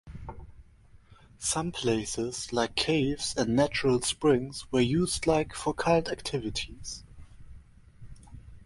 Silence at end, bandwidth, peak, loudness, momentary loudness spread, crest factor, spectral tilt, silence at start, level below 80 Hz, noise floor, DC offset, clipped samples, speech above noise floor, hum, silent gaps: 0 s; 11.5 kHz; -10 dBFS; -28 LUFS; 12 LU; 20 dB; -4.5 dB/octave; 0.05 s; -50 dBFS; -56 dBFS; under 0.1%; under 0.1%; 28 dB; none; none